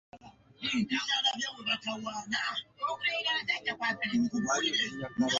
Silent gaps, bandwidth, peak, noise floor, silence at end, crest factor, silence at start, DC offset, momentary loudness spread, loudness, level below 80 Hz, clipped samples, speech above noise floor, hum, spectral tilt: none; 7.8 kHz; -16 dBFS; -53 dBFS; 0 s; 16 dB; 0.15 s; under 0.1%; 7 LU; -31 LUFS; -68 dBFS; under 0.1%; 21 dB; none; -2.5 dB/octave